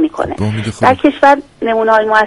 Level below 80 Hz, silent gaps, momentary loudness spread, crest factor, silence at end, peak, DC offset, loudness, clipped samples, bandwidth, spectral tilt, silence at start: -42 dBFS; none; 8 LU; 12 dB; 0 s; 0 dBFS; under 0.1%; -12 LUFS; 0.1%; 11.5 kHz; -6.5 dB/octave; 0 s